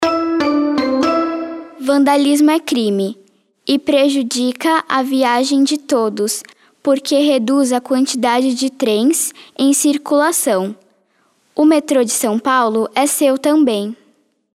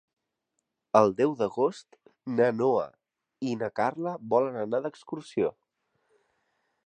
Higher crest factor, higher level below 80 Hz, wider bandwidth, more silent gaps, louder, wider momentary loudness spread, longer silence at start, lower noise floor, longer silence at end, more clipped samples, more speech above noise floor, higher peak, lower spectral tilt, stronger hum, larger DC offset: second, 16 dB vs 24 dB; first, -64 dBFS vs -72 dBFS; first, 15.5 kHz vs 9.6 kHz; neither; first, -15 LUFS vs -28 LUFS; second, 7 LU vs 13 LU; second, 0 s vs 0.95 s; second, -59 dBFS vs -82 dBFS; second, 0.6 s vs 1.35 s; neither; second, 45 dB vs 55 dB; first, 0 dBFS vs -6 dBFS; second, -3 dB/octave vs -7 dB/octave; neither; neither